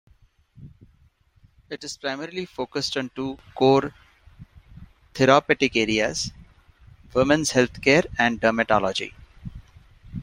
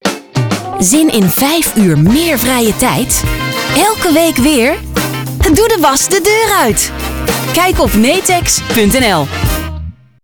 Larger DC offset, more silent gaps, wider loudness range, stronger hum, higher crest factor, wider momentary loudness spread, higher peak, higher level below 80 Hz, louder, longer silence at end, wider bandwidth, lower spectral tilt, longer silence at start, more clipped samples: neither; neither; first, 6 LU vs 1 LU; neither; first, 22 dB vs 10 dB; first, 19 LU vs 7 LU; about the same, -2 dBFS vs -2 dBFS; second, -50 dBFS vs -26 dBFS; second, -22 LUFS vs -10 LUFS; second, 0 s vs 0.3 s; second, 16 kHz vs over 20 kHz; about the same, -4 dB/octave vs -4 dB/octave; first, 0.6 s vs 0.05 s; neither